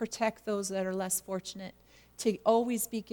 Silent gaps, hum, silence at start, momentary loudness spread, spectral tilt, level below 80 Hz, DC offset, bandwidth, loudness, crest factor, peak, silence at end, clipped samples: none; none; 0 s; 13 LU; -4 dB/octave; -68 dBFS; under 0.1%; 19 kHz; -32 LUFS; 20 dB; -12 dBFS; 0.1 s; under 0.1%